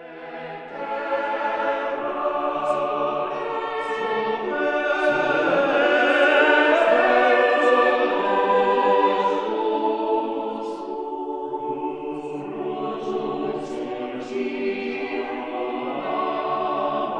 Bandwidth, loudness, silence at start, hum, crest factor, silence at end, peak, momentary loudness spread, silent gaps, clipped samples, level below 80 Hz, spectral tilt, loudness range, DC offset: 9.6 kHz; -22 LUFS; 0 s; none; 18 dB; 0 s; -4 dBFS; 13 LU; none; under 0.1%; -64 dBFS; -5 dB/octave; 11 LU; under 0.1%